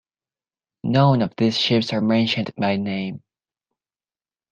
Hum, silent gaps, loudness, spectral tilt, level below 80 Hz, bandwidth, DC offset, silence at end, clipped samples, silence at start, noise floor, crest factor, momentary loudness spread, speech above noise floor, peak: none; none; -20 LUFS; -6.5 dB/octave; -60 dBFS; 8.8 kHz; under 0.1%; 1.35 s; under 0.1%; 0.85 s; under -90 dBFS; 20 dB; 12 LU; over 70 dB; -2 dBFS